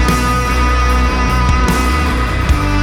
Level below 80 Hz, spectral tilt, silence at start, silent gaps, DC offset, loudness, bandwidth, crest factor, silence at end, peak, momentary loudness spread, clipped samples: -16 dBFS; -5.5 dB/octave; 0 s; none; under 0.1%; -14 LUFS; 16 kHz; 12 dB; 0 s; -2 dBFS; 2 LU; under 0.1%